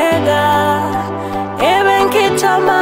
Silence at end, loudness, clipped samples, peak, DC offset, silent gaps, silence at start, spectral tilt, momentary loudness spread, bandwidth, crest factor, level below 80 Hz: 0 s; -13 LUFS; under 0.1%; -2 dBFS; under 0.1%; none; 0 s; -4.5 dB/octave; 9 LU; 16.5 kHz; 12 dB; -46 dBFS